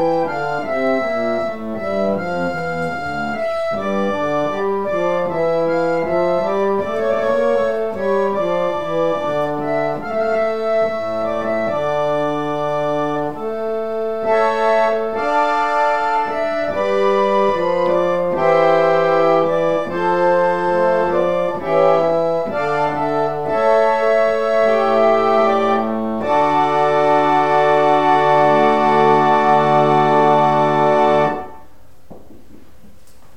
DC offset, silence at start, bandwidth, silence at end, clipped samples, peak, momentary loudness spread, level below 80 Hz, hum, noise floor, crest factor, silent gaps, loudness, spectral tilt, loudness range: 2%; 0 s; 10 kHz; 1.2 s; under 0.1%; 0 dBFS; 7 LU; -50 dBFS; none; -48 dBFS; 16 dB; none; -17 LUFS; -6.5 dB/octave; 6 LU